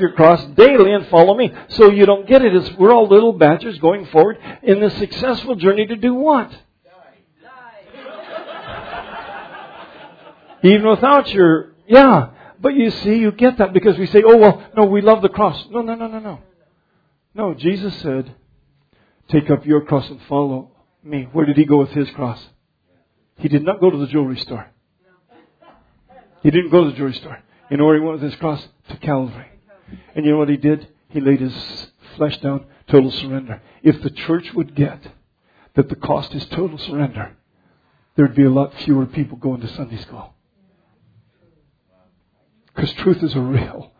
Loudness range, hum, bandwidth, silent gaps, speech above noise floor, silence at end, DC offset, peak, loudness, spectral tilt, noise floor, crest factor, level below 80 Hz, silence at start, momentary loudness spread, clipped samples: 12 LU; none; 5.4 kHz; none; 49 dB; 0.2 s; under 0.1%; 0 dBFS; -15 LUFS; -9.5 dB/octave; -63 dBFS; 16 dB; -48 dBFS; 0 s; 20 LU; 0.1%